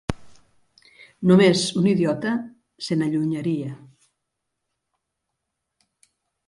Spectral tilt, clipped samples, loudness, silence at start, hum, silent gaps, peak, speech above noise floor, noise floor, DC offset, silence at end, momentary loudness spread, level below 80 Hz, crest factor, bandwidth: -6 dB/octave; under 0.1%; -21 LUFS; 0.1 s; none; none; -4 dBFS; 60 dB; -80 dBFS; under 0.1%; 2.7 s; 19 LU; -54 dBFS; 20 dB; 11.5 kHz